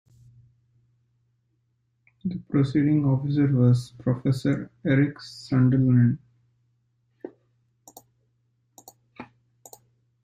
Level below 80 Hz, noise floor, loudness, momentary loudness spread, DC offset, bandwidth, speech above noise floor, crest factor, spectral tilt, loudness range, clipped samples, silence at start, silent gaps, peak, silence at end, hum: -60 dBFS; -72 dBFS; -23 LUFS; 24 LU; under 0.1%; 14.5 kHz; 50 dB; 18 dB; -8.5 dB/octave; 5 LU; under 0.1%; 2.25 s; none; -8 dBFS; 1 s; none